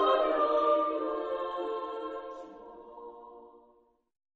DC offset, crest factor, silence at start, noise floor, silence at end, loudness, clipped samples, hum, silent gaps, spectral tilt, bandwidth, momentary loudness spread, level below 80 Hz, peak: under 0.1%; 18 dB; 0 s; -66 dBFS; 0.8 s; -30 LUFS; under 0.1%; none; none; -4.5 dB/octave; 6.4 kHz; 22 LU; -68 dBFS; -16 dBFS